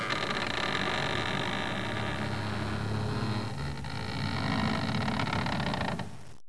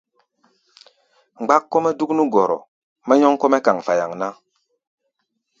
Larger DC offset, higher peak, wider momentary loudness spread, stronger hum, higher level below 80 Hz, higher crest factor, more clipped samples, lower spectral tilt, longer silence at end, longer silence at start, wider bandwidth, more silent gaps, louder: first, 0.8% vs under 0.1%; second, -16 dBFS vs 0 dBFS; second, 6 LU vs 13 LU; neither; first, -48 dBFS vs -68 dBFS; about the same, 16 dB vs 20 dB; neither; about the same, -5 dB/octave vs -5.5 dB/octave; second, 0.15 s vs 1.25 s; second, 0 s vs 1.4 s; first, 11 kHz vs 7.8 kHz; second, none vs 2.68-2.96 s; second, -32 LUFS vs -18 LUFS